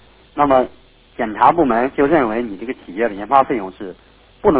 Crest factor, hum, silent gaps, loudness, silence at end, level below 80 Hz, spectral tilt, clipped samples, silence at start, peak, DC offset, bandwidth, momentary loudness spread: 18 dB; none; none; -17 LUFS; 0 s; -46 dBFS; -10 dB/octave; under 0.1%; 0.35 s; 0 dBFS; under 0.1%; 4 kHz; 15 LU